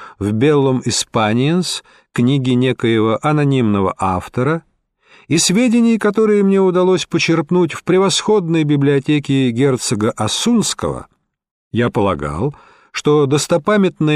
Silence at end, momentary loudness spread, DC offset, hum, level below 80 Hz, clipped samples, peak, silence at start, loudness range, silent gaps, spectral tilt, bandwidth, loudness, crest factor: 0 s; 7 LU; under 0.1%; none; -48 dBFS; under 0.1%; -2 dBFS; 0 s; 4 LU; 11.51-11.71 s; -5 dB/octave; 15 kHz; -15 LUFS; 12 dB